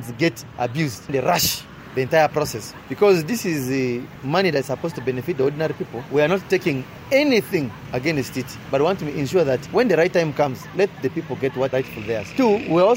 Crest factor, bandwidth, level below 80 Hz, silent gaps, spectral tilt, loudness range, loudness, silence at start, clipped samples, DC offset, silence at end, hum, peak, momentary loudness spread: 16 dB; 16.5 kHz; -52 dBFS; none; -5 dB/octave; 1 LU; -21 LUFS; 0 s; under 0.1%; under 0.1%; 0 s; none; -6 dBFS; 10 LU